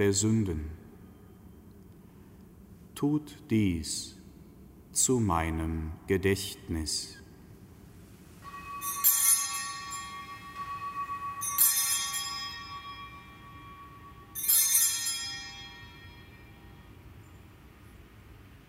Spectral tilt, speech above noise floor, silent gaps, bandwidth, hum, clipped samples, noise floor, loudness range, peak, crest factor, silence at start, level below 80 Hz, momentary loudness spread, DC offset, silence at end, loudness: -3 dB/octave; 23 dB; none; 16 kHz; none; under 0.1%; -52 dBFS; 6 LU; -8 dBFS; 24 dB; 0 s; -50 dBFS; 25 LU; under 0.1%; 0.1 s; -28 LUFS